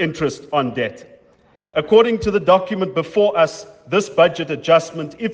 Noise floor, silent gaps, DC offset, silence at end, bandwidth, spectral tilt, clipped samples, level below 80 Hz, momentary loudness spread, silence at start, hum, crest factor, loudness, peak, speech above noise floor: -55 dBFS; none; under 0.1%; 0 s; 9.4 kHz; -5.5 dB/octave; under 0.1%; -50 dBFS; 11 LU; 0 s; none; 18 dB; -18 LUFS; 0 dBFS; 38 dB